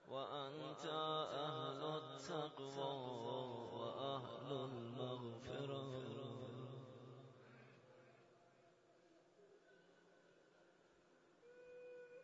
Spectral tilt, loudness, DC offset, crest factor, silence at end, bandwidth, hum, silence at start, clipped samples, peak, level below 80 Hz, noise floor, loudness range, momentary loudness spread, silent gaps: -4.5 dB/octave; -48 LUFS; under 0.1%; 18 dB; 0 s; 7.6 kHz; none; 0 s; under 0.1%; -32 dBFS; -86 dBFS; -73 dBFS; 20 LU; 19 LU; none